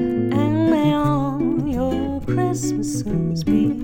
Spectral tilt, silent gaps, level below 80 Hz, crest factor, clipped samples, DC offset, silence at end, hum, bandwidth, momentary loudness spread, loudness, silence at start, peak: -7 dB/octave; none; -38 dBFS; 14 dB; under 0.1%; under 0.1%; 0 s; none; 17 kHz; 5 LU; -20 LUFS; 0 s; -6 dBFS